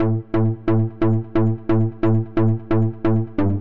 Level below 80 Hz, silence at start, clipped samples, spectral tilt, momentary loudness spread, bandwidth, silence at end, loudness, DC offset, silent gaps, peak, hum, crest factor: -44 dBFS; 0 s; under 0.1%; -11.5 dB/octave; 2 LU; 4.3 kHz; 0 s; -20 LUFS; 3%; none; -8 dBFS; none; 10 dB